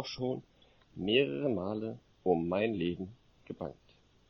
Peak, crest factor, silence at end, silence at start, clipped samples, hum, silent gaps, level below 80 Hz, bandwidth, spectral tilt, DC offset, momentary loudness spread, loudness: -14 dBFS; 20 dB; 0.55 s; 0 s; under 0.1%; none; none; -64 dBFS; 6.4 kHz; -6.5 dB/octave; under 0.1%; 15 LU; -34 LUFS